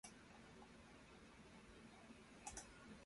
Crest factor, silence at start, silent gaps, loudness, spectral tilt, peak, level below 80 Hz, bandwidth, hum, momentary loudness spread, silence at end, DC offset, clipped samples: 22 dB; 0.05 s; none; -61 LUFS; -3 dB/octave; -38 dBFS; -72 dBFS; 11.5 kHz; none; 8 LU; 0 s; under 0.1%; under 0.1%